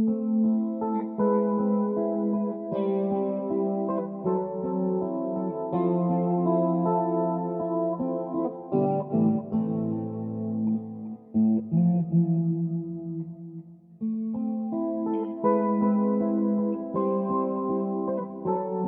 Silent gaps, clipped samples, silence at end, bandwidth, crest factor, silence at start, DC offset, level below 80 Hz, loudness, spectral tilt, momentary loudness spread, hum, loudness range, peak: none; under 0.1%; 0 s; 3.6 kHz; 16 dB; 0 s; under 0.1%; -68 dBFS; -27 LUFS; -12 dB/octave; 7 LU; none; 2 LU; -12 dBFS